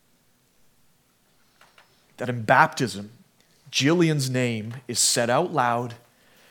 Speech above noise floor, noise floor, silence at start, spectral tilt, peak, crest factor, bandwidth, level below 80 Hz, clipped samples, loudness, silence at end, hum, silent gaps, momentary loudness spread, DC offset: 41 dB; -64 dBFS; 2.2 s; -3.5 dB/octave; -2 dBFS; 24 dB; 19 kHz; -74 dBFS; under 0.1%; -23 LUFS; 0.55 s; none; none; 14 LU; under 0.1%